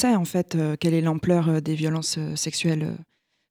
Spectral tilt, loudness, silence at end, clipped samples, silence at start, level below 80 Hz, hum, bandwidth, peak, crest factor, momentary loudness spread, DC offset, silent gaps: -5.5 dB/octave; -24 LUFS; 0.5 s; under 0.1%; 0 s; -58 dBFS; none; 16.5 kHz; -10 dBFS; 14 dB; 5 LU; under 0.1%; none